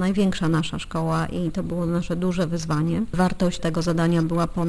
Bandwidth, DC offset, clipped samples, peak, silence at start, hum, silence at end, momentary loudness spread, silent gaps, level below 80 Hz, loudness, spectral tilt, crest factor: 11 kHz; under 0.1%; under 0.1%; -8 dBFS; 0 s; none; 0 s; 5 LU; none; -40 dBFS; -24 LUFS; -6.5 dB/octave; 14 dB